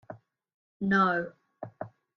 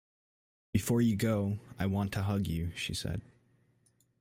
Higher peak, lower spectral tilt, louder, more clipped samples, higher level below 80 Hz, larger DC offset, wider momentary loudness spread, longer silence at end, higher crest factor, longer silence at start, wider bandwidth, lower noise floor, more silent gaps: first, -12 dBFS vs -16 dBFS; first, -7.5 dB/octave vs -6 dB/octave; first, -27 LUFS vs -33 LUFS; neither; second, -70 dBFS vs -56 dBFS; neither; first, 24 LU vs 8 LU; second, 0.3 s vs 1 s; about the same, 20 dB vs 18 dB; second, 0.1 s vs 0.75 s; second, 6.4 kHz vs 16 kHz; second, -50 dBFS vs -71 dBFS; first, 0.54-0.80 s vs none